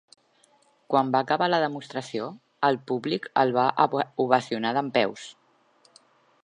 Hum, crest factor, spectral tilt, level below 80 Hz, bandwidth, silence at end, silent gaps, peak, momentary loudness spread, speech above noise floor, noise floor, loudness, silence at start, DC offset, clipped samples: none; 24 dB; -5.5 dB/octave; -78 dBFS; 10.5 kHz; 1.15 s; none; -2 dBFS; 11 LU; 38 dB; -63 dBFS; -25 LUFS; 0.9 s; under 0.1%; under 0.1%